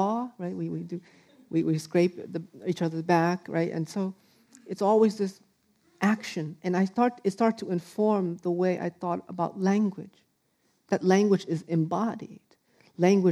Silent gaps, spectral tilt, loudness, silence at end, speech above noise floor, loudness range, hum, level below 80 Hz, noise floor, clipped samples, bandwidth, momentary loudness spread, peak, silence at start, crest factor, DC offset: none; -7 dB/octave; -27 LUFS; 0 s; 45 dB; 2 LU; none; -78 dBFS; -71 dBFS; under 0.1%; 13 kHz; 12 LU; -8 dBFS; 0 s; 18 dB; under 0.1%